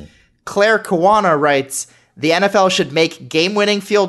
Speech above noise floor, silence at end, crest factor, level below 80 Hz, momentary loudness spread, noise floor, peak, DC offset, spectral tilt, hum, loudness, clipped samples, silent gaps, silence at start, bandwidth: 21 dB; 0 s; 14 dB; -56 dBFS; 11 LU; -36 dBFS; -2 dBFS; under 0.1%; -4 dB/octave; none; -15 LUFS; under 0.1%; none; 0 s; 12.5 kHz